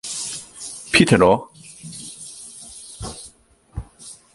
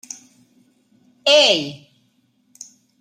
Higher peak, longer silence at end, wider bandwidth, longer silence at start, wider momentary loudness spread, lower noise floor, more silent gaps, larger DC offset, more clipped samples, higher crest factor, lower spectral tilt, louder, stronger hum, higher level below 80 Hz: about the same, 0 dBFS vs -2 dBFS; second, 0.2 s vs 1.25 s; second, 11.5 kHz vs 14 kHz; second, 0.05 s vs 1.25 s; about the same, 24 LU vs 24 LU; second, -51 dBFS vs -62 dBFS; neither; neither; neither; about the same, 22 dB vs 22 dB; first, -4 dB/octave vs -1.5 dB/octave; about the same, -17 LUFS vs -15 LUFS; neither; first, -44 dBFS vs -76 dBFS